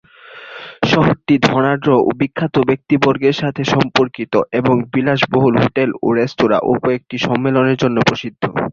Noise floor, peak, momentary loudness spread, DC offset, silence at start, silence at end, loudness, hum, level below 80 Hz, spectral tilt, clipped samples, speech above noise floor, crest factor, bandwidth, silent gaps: -37 dBFS; 0 dBFS; 6 LU; under 0.1%; 0.3 s; 0 s; -15 LUFS; none; -48 dBFS; -6.5 dB/octave; under 0.1%; 23 dB; 16 dB; 7.6 kHz; none